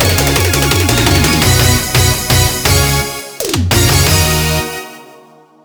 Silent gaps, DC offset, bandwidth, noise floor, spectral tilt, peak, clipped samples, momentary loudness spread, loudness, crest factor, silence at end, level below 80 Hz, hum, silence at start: none; under 0.1%; over 20 kHz; -42 dBFS; -3.5 dB/octave; 0 dBFS; under 0.1%; 9 LU; -11 LUFS; 12 dB; 0.6 s; -24 dBFS; none; 0 s